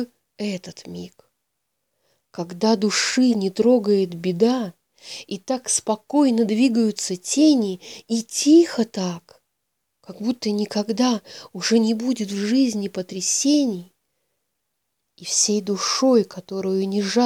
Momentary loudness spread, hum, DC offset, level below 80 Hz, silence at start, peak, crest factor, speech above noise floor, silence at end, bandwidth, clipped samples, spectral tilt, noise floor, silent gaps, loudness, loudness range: 16 LU; none; under 0.1%; -72 dBFS; 0 s; -6 dBFS; 16 dB; 57 dB; 0 s; 15 kHz; under 0.1%; -4 dB/octave; -77 dBFS; none; -21 LUFS; 4 LU